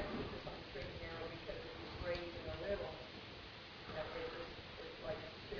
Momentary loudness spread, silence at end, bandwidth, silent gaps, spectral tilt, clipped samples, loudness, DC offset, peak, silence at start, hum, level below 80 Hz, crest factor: 7 LU; 0 s; 5.4 kHz; none; -3.5 dB/octave; under 0.1%; -47 LUFS; under 0.1%; -28 dBFS; 0 s; none; -60 dBFS; 18 dB